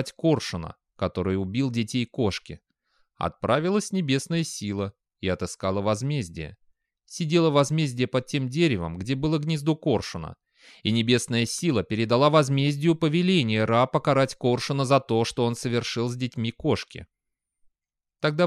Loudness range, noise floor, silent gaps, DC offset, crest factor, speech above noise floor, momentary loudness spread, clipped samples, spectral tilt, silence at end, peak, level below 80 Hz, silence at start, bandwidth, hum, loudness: 6 LU; -86 dBFS; none; under 0.1%; 18 dB; 61 dB; 11 LU; under 0.1%; -5.5 dB/octave; 0 s; -6 dBFS; -54 dBFS; 0 s; 13.5 kHz; none; -25 LUFS